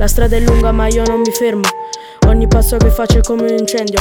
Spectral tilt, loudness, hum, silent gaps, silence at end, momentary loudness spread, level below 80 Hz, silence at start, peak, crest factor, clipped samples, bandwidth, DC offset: -5.5 dB/octave; -13 LUFS; none; none; 0 s; 5 LU; -14 dBFS; 0 s; 0 dBFS; 10 dB; under 0.1%; 20 kHz; under 0.1%